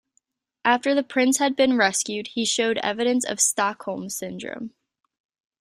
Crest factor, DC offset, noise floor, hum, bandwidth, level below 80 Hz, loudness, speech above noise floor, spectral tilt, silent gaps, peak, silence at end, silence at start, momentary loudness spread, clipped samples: 20 dB; under 0.1%; -70 dBFS; none; 15.5 kHz; -68 dBFS; -22 LUFS; 48 dB; -2 dB/octave; none; -4 dBFS; 0.95 s; 0.65 s; 13 LU; under 0.1%